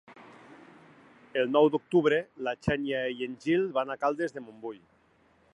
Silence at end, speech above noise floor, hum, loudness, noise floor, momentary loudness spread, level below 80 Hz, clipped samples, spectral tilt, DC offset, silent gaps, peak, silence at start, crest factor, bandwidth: 0.75 s; 36 dB; none; -28 LUFS; -65 dBFS; 17 LU; -60 dBFS; under 0.1%; -6.5 dB/octave; under 0.1%; none; -10 dBFS; 0.1 s; 20 dB; 10.5 kHz